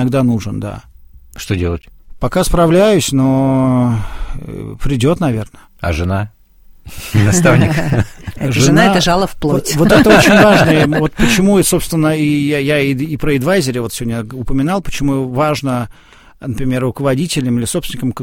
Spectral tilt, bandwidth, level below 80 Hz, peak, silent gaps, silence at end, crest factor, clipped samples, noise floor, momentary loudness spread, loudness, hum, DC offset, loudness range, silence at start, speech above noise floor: -5.5 dB/octave; 17 kHz; -30 dBFS; 0 dBFS; none; 0 s; 14 dB; 0.2%; -41 dBFS; 15 LU; -13 LUFS; none; 0.4%; 8 LU; 0 s; 29 dB